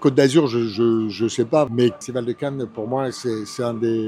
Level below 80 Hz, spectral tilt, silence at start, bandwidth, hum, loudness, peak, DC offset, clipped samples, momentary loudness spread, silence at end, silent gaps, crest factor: -64 dBFS; -6 dB/octave; 0 s; 12.5 kHz; none; -21 LUFS; -2 dBFS; under 0.1%; under 0.1%; 10 LU; 0 s; none; 18 dB